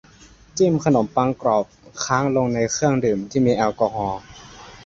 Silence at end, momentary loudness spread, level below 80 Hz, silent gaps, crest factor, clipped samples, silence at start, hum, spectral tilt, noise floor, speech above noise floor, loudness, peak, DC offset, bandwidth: 0 s; 14 LU; -50 dBFS; none; 18 dB; under 0.1%; 0.55 s; none; -5.5 dB/octave; -48 dBFS; 29 dB; -20 LUFS; -2 dBFS; under 0.1%; 7.8 kHz